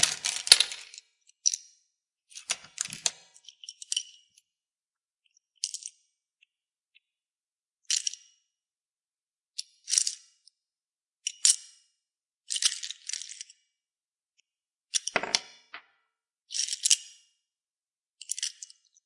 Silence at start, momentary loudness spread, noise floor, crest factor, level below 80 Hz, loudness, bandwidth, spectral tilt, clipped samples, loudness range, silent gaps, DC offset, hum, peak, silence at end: 0 s; 24 LU; under -90 dBFS; 34 dB; -78 dBFS; -27 LUFS; 12 kHz; 3 dB/octave; under 0.1%; 10 LU; 5.14-5.18 s, 8.93-8.97 s, 9.08-9.12 s, 14.08-14.13 s; under 0.1%; none; 0 dBFS; 0.55 s